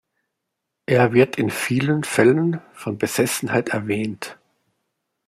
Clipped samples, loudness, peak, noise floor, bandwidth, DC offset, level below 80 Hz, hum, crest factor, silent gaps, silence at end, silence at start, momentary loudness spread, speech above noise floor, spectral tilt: under 0.1%; -20 LUFS; -2 dBFS; -80 dBFS; 16 kHz; under 0.1%; -62 dBFS; none; 18 dB; none; 0.95 s; 0.9 s; 13 LU; 60 dB; -5.5 dB/octave